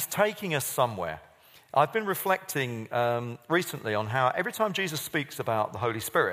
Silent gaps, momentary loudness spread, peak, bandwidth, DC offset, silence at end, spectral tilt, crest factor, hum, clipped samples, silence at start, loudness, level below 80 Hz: none; 5 LU; -8 dBFS; 15.5 kHz; under 0.1%; 0 s; -4 dB/octave; 20 dB; none; under 0.1%; 0 s; -28 LUFS; -68 dBFS